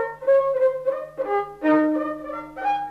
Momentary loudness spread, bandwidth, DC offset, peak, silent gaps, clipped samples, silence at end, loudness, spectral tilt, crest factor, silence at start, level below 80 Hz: 10 LU; 5.2 kHz; under 0.1%; -10 dBFS; none; under 0.1%; 0 s; -23 LUFS; -7 dB/octave; 14 dB; 0 s; -60 dBFS